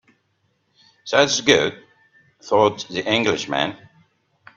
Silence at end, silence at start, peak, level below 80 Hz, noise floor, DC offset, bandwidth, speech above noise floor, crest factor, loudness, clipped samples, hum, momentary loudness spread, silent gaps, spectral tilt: 0.8 s; 1.05 s; 0 dBFS; -60 dBFS; -68 dBFS; under 0.1%; 10 kHz; 48 dB; 22 dB; -19 LUFS; under 0.1%; none; 10 LU; none; -3 dB/octave